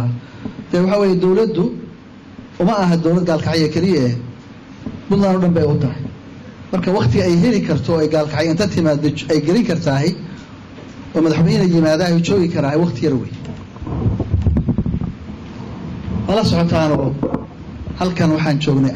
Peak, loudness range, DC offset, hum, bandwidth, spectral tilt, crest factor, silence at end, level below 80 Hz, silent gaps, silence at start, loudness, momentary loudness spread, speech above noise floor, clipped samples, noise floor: -8 dBFS; 3 LU; under 0.1%; none; 9.6 kHz; -7 dB/octave; 10 dB; 0 s; -34 dBFS; none; 0 s; -17 LUFS; 18 LU; 23 dB; under 0.1%; -38 dBFS